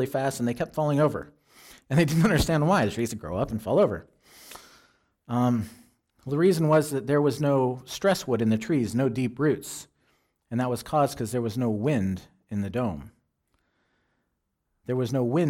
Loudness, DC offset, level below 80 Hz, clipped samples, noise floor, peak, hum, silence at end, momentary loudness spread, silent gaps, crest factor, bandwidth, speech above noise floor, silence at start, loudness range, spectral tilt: -26 LUFS; under 0.1%; -50 dBFS; under 0.1%; -78 dBFS; -12 dBFS; none; 0 s; 15 LU; none; 14 dB; 16.5 kHz; 53 dB; 0 s; 6 LU; -6.5 dB/octave